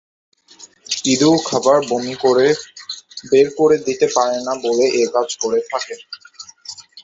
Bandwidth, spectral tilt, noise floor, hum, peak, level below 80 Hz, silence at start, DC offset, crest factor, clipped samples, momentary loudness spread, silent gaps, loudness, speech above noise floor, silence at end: 8 kHz; -3.5 dB/octave; -45 dBFS; none; -2 dBFS; -60 dBFS; 0.6 s; under 0.1%; 16 dB; under 0.1%; 18 LU; none; -16 LUFS; 29 dB; 0.05 s